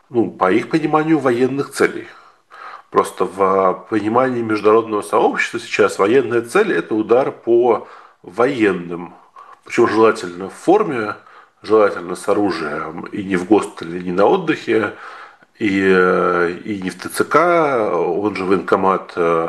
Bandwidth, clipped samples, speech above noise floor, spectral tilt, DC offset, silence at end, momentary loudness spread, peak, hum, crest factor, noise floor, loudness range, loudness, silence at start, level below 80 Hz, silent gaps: 12.5 kHz; under 0.1%; 22 dB; -6 dB/octave; under 0.1%; 0 s; 12 LU; 0 dBFS; none; 16 dB; -39 dBFS; 3 LU; -17 LUFS; 0.1 s; -62 dBFS; none